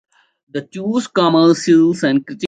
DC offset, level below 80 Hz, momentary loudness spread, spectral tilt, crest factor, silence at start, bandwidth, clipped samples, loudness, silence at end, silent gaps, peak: under 0.1%; -62 dBFS; 15 LU; -5.5 dB/octave; 14 dB; 0.55 s; 9.2 kHz; under 0.1%; -14 LUFS; 0 s; none; -2 dBFS